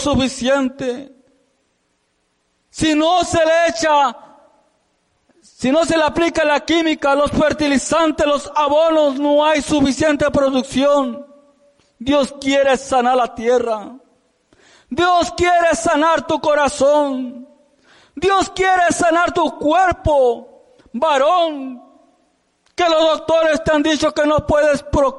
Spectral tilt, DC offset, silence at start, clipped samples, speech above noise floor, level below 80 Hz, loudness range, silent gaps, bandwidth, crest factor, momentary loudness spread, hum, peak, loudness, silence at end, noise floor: -4 dB/octave; under 0.1%; 0 s; under 0.1%; 50 dB; -40 dBFS; 3 LU; none; 11.5 kHz; 12 dB; 7 LU; none; -6 dBFS; -16 LUFS; 0 s; -66 dBFS